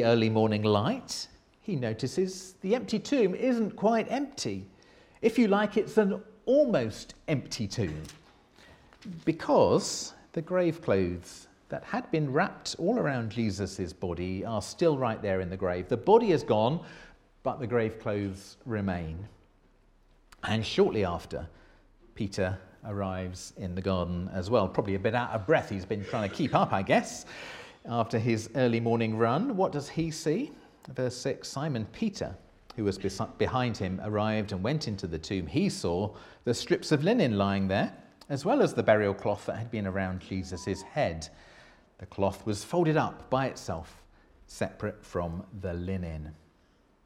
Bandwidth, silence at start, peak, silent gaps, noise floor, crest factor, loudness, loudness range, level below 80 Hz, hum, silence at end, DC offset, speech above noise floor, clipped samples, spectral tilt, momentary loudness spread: 15 kHz; 0 s; -8 dBFS; none; -64 dBFS; 22 dB; -30 LUFS; 6 LU; -56 dBFS; none; 0.7 s; under 0.1%; 35 dB; under 0.1%; -6 dB/octave; 14 LU